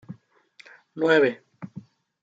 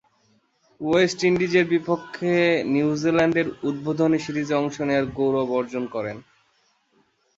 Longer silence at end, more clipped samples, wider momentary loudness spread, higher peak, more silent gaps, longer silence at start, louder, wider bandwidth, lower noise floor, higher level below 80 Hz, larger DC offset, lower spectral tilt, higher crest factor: second, 0.4 s vs 1.15 s; neither; first, 26 LU vs 9 LU; about the same, -6 dBFS vs -6 dBFS; neither; second, 0.1 s vs 0.8 s; about the same, -22 LUFS vs -22 LUFS; about the same, 7.8 kHz vs 7.8 kHz; second, -56 dBFS vs -65 dBFS; second, -78 dBFS vs -58 dBFS; neither; about the same, -6 dB/octave vs -6 dB/octave; about the same, 22 dB vs 18 dB